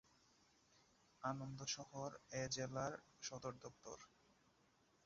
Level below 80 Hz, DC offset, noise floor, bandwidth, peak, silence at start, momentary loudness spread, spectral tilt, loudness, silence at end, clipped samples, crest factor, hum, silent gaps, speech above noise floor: -78 dBFS; under 0.1%; -77 dBFS; 7.4 kHz; -30 dBFS; 1.2 s; 13 LU; -4 dB/octave; -49 LUFS; 1 s; under 0.1%; 22 dB; none; none; 28 dB